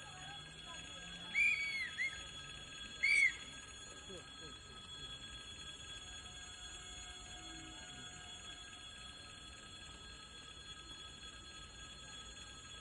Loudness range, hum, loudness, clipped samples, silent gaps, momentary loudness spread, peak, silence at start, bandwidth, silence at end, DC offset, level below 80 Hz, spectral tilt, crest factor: 15 LU; none; -42 LUFS; under 0.1%; none; 19 LU; -22 dBFS; 0 s; 11.5 kHz; 0 s; under 0.1%; -64 dBFS; -1 dB/octave; 22 dB